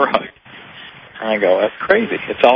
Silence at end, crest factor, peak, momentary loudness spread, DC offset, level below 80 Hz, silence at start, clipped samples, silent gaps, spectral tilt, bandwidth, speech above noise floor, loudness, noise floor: 0 s; 18 dB; 0 dBFS; 21 LU; under 0.1%; -56 dBFS; 0 s; under 0.1%; none; -6.5 dB/octave; 6.2 kHz; 24 dB; -17 LUFS; -39 dBFS